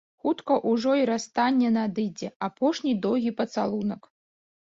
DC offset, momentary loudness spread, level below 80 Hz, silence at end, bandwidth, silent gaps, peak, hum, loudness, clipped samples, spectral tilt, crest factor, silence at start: under 0.1%; 9 LU; -68 dBFS; 0.75 s; 7.8 kHz; 2.35-2.40 s; -10 dBFS; none; -26 LUFS; under 0.1%; -5.5 dB/octave; 16 dB; 0.25 s